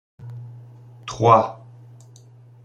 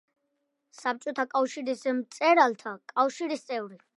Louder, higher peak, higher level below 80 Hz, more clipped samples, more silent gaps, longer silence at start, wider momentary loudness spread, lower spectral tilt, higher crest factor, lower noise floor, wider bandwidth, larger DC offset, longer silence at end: first, -18 LUFS vs -28 LUFS; first, -2 dBFS vs -8 dBFS; first, -58 dBFS vs -88 dBFS; neither; neither; second, 0.2 s vs 0.8 s; first, 25 LU vs 12 LU; first, -6.5 dB/octave vs -3.5 dB/octave; about the same, 22 dB vs 22 dB; second, -47 dBFS vs -79 dBFS; second, 9.2 kHz vs 11.5 kHz; neither; first, 1.1 s vs 0.2 s